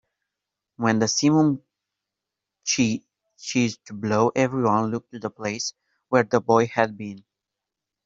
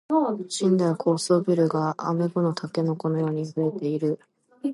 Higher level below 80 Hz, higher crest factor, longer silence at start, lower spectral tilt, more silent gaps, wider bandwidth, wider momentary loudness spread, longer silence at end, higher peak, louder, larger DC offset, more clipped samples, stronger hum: first, -64 dBFS vs -74 dBFS; first, 22 dB vs 16 dB; first, 0.8 s vs 0.1 s; second, -4.5 dB/octave vs -6.5 dB/octave; neither; second, 7.8 kHz vs 11.5 kHz; first, 13 LU vs 5 LU; first, 0.85 s vs 0 s; first, -2 dBFS vs -10 dBFS; about the same, -23 LUFS vs -25 LUFS; neither; neither; neither